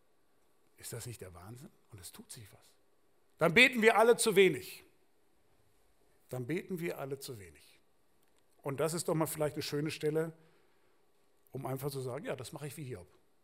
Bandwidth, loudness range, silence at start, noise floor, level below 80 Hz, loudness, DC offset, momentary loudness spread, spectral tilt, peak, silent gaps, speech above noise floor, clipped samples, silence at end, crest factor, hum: 16 kHz; 15 LU; 0.8 s; -75 dBFS; -72 dBFS; -31 LUFS; under 0.1%; 25 LU; -4 dB/octave; -10 dBFS; none; 42 dB; under 0.1%; 0.4 s; 26 dB; none